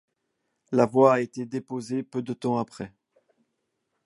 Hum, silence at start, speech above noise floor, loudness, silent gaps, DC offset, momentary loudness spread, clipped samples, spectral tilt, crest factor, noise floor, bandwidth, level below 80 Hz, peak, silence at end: none; 0.7 s; 54 dB; -25 LUFS; none; under 0.1%; 16 LU; under 0.1%; -7 dB/octave; 22 dB; -78 dBFS; 11.5 kHz; -70 dBFS; -6 dBFS; 1.2 s